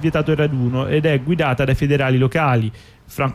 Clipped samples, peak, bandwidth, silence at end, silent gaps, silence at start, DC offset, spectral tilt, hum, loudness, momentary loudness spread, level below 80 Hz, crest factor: under 0.1%; -6 dBFS; 14 kHz; 0 s; none; 0 s; under 0.1%; -7.5 dB/octave; none; -18 LUFS; 5 LU; -38 dBFS; 12 dB